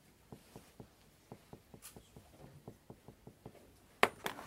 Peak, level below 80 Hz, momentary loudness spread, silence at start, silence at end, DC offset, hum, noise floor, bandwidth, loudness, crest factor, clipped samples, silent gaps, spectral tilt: -6 dBFS; -70 dBFS; 25 LU; 0.3 s; 0 s; under 0.1%; none; -63 dBFS; 16 kHz; -34 LUFS; 40 dB; under 0.1%; none; -3 dB/octave